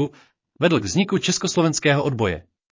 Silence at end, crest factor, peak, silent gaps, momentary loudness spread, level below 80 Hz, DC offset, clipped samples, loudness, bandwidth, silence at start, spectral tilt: 0.35 s; 16 dB; -6 dBFS; none; 6 LU; -48 dBFS; under 0.1%; under 0.1%; -21 LUFS; 7.8 kHz; 0 s; -4.5 dB/octave